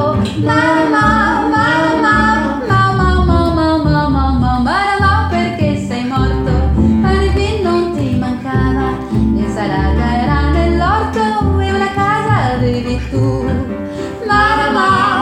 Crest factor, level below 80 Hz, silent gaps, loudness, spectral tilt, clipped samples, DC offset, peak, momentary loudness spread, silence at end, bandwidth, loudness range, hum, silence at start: 12 dB; -22 dBFS; none; -14 LUFS; -7 dB/octave; under 0.1%; under 0.1%; 0 dBFS; 5 LU; 0 s; 11 kHz; 3 LU; none; 0 s